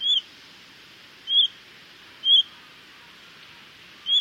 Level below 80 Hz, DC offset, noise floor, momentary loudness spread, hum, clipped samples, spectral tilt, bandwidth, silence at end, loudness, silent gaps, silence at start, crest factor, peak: -74 dBFS; under 0.1%; -49 dBFS; 16 LU; none; under 0.1%; 0.5 dB/octave; 16 kHz; 0 s; -20 LUFS; none; 0 s; 16 dB; -10 dBFS